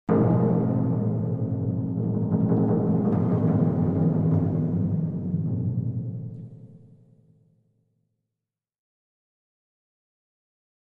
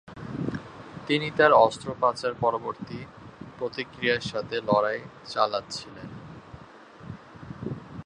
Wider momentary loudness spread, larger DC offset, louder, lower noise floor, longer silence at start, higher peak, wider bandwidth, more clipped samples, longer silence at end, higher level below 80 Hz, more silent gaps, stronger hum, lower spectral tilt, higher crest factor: second, 8 LU vs 23 LU; neither; about the same, -24 LUFS vs -26 LUFS; first, -88 dBFS vs -48 dBFS; about the same, 0.1 s vs 0.05 s; second, -10 dBFS vs -4 dBFS; second, 2.5 kHz vs 10.5 kHz; neither; first, 4.1 s vs 0.05 s; about the same, -56 dBFS vs -58 dBFS; neither; neither; first, -13 dB/octave vs -5 dB/octave; second, 16 dB vs 24 dB